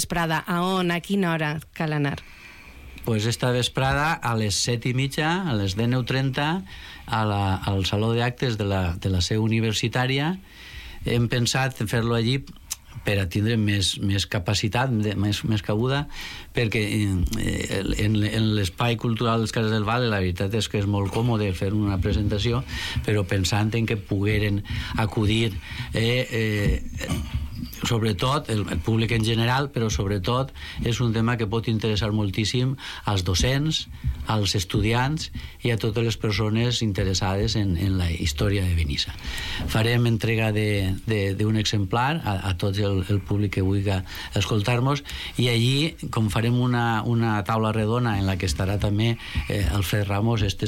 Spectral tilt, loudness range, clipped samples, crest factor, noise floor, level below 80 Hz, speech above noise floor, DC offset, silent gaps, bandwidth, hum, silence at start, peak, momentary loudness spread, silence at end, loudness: -5.5 dB/octave; 2 LU; under 0.1%; 14 dB; -44 dBFS; -38 dBFS; 20 dB; under 0.1%; none; 16.5 kHz; none; 0 s; -10 dBFS; 6 LU; 0 s; -24 LUFS